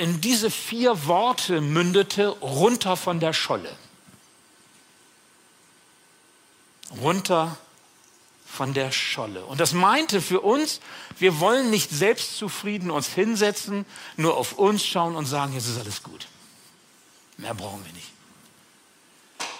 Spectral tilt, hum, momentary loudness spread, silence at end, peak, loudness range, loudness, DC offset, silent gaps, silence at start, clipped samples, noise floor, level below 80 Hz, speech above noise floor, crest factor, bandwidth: -4 dB/octave; none; 16 LU; 0 s; -4 dBFS; 11 LU; -23 LUFS; under 0.1%; none; 0 s; under 0.1%; -57 dBFS; -70 dBFS; 33 dB; 20 dB; 16 kHz